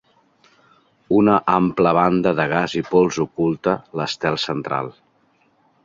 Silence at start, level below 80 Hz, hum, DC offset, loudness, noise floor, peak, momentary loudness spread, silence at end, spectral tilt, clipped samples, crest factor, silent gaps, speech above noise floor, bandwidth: 1.1 s; -54 dBFS; none; under 0.1%; -19 LUFS; -61 dBFS; -2 dBFS; 8 LU; 0.95 s; -6 dB/octave; under 0.1%; 18 dB; none; 42 dB; 7.6 kHz